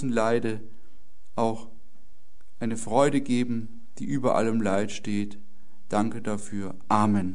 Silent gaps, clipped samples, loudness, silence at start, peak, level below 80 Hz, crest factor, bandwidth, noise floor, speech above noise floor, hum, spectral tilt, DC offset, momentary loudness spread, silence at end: none; under 0.1%; -27 LUFS; 0 s; -6 dBFS; -58 dBFS; 22 dB; 11 kHz; -60 dBFS; 34 dB; none; -6 dB/octave; 3%; 13 LU; 0 s